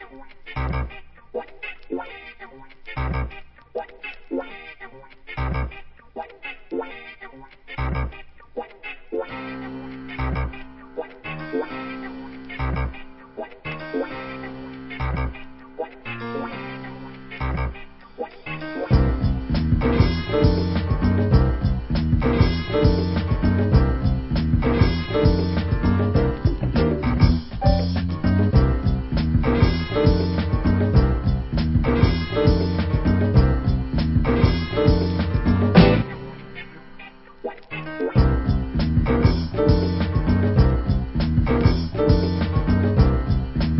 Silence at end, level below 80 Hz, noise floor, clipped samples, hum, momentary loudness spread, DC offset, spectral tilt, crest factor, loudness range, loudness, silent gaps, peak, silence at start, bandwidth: 0 s; -26 dBFS; -42 dBFS; under 0.1%; none; 18 LU; 0.1%; -11.5 dB/octave; 20 dB; 12 LU; -22 LUFS; none; -2 dBFS; 0 s; 5.8 kHz